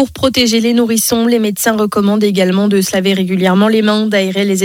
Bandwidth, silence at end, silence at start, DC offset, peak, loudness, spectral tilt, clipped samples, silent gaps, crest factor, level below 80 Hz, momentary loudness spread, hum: 17.5 kHz; 0 s; 0 s; under 0.1%; 0 dBFS; -12 LUFS; -4.5 dB/octave; under 0.1%; none; 12 dB; -46 dBFS; 3 LU; none